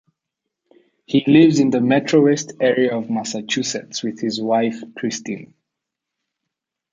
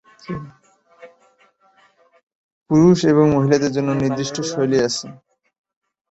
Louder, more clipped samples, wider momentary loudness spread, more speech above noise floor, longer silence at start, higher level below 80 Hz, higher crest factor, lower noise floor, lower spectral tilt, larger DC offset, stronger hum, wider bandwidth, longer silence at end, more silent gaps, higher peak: about the same, -18 LUFS vs -17 LUFS; neither; second, 13 LU vs 18 LU; first, 64 dB vs 40 dB; first, 1.1 s vs 0.3 s; second, -64 dBFS vs -52 dBFS; about the same, 18 dB vs 18 dB; first, -82 dBFS vs -57 dBFS; about the same, -5 dB/octave vs -6 dB/octave; neither; neither; first, 9.2 kHz vs 8.2 kHz; first, 1.45 s vs 0.95 s; second, none vs 2.23-2.27 s, 2.35-2.66 s; about the same, -2 dBFS vs -2 dBFS